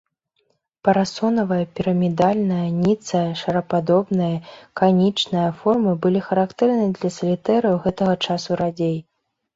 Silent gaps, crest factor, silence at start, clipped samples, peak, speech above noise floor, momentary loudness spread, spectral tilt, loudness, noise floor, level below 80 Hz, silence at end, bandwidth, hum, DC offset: none; 18 dB; 0.85 s; under 0.1%; -2 dBFS; 49 dB; 5 LU; -7 dB/octave; -20 LUFS; -69 dBFS; -56 dBFS; 0.55 s; 7.8 kHz; none; under 0.1%